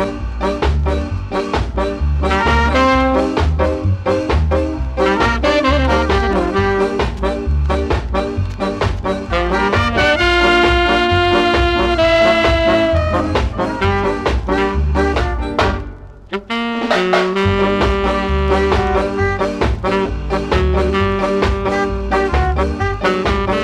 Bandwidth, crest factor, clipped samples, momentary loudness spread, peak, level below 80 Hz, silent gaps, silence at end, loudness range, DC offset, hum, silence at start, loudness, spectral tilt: 10.5 kHz; 14 dB; under 0.1%; 7 LU; -2 dBFS; -22 dBFS; none; 0 s; 5 LU; under 0.1%; none; 0 s; -16 LUFS; -6 dB/octave